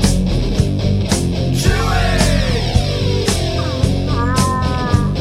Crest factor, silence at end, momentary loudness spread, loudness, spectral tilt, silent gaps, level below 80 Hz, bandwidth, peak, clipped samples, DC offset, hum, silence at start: 14 dB; 0 s; 3 LU; -16 LUFS; -5.5 dB/octave; none; -22 dBFS; 15.5 kHz; 0 dBFS; under 0.1%; under 0.1%; none; 0 s